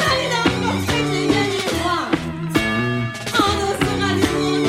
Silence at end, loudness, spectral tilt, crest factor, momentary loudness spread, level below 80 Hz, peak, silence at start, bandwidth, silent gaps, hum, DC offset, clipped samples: 0 s; -19 LUFS; -4.5 dB/octave; 16 dB; 4 LU; -40 dBFS; -2 dBFS; 0 s; 16 kHz; none; none; under 0.1%; under 0.1%